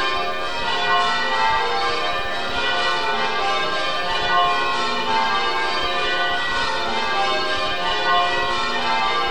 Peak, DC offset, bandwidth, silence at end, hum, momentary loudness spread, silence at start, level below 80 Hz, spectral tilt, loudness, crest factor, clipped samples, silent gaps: -6 dBFS; 4%; 20 kHz; 0 s; none; 4 LU; 0 s; -44 dBFS; -2.5 dB/octave; -20 LUFS; 16 dB; under 0.1%; none